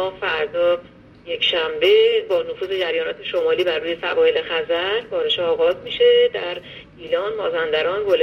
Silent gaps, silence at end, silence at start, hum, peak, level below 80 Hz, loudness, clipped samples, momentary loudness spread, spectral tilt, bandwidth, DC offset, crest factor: none; 0 s; 0 s; none; -4 dBFS; -56 dBFS; -19 LUFS; under 0.1%; 10 LU; -4.5 dB/octave; 6.4 kHz; under 0.1%; 16 dB